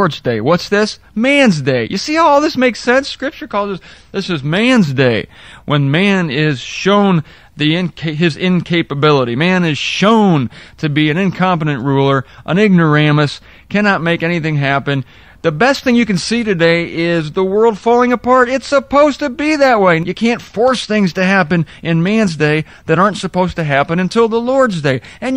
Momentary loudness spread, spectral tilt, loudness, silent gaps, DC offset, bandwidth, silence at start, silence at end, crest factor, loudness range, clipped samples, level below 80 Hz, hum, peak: 8 LU; -6 dB/octave; -13 LUFS; none; 0.3%; 11 kHz; 0 s; 0 s; 14 dB; 2 LU; under 0.1%; -46 dBFS; none; 0 dBFS